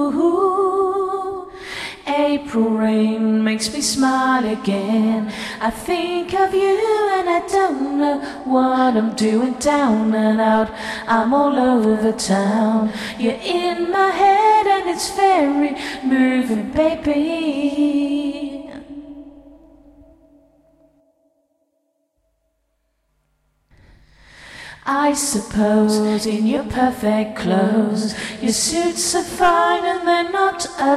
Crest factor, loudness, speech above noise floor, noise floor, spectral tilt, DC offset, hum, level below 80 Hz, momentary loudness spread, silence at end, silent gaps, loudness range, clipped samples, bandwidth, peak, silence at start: 16 dB; -18 LUFS; 51 dB; -69 dBFS; -4.5 dB/octave; under 0.1%; none; -48 dBFS; 8 LU; 0 s; none; 6 LU; under 0.1%; 13.5 kHz; -2 dBFS; 0 s